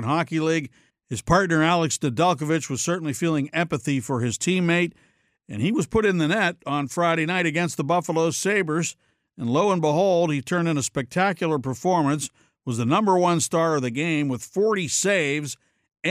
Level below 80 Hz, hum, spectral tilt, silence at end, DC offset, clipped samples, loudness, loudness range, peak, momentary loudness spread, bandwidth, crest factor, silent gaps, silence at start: -54 dBFS; none; -5 dB/octave; 0 s; under 0.1%; under 0.1%; -23 LUFS; 1 LU; -6 dBFS; 8 LU; 15.5 kHz; 16 dB; none; 0 s